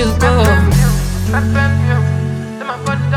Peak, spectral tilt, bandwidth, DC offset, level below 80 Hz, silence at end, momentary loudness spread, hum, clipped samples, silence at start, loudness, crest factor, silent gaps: 0 dBFS; -6 dB/octave; 16.5 kHz; under 0.1%; -22 dBFS; 0 s; 10 LU; none; under 0.1%; 0 s; -14 LUFS; 12 dB; none